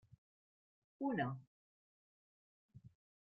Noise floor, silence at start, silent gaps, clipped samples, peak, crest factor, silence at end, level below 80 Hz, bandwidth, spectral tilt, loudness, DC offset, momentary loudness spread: under -90 dBFS; 1 s; 1.47-2.69 s; under 0.1%; -28 dBFS; 22 dB; 0.35 s; -82 dBFS; 4.8 kHz; -6 dB/octave; -43 LUFS; under 0.1%; 24 LU